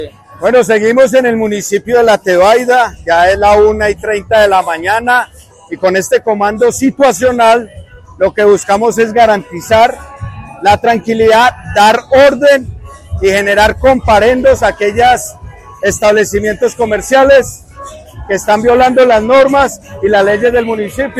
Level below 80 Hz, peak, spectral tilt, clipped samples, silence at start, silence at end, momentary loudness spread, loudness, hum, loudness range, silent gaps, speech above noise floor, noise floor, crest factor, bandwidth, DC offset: -34 dBFS; 0 dBFS; -4 dB/octave; under 0.1%; 0 s; 0 s; 9 LU; -9 LUFS; none; 2 LU; none; 21 dB; -30 dBFS; 10 dB; 15.5 kHz; under 0.1%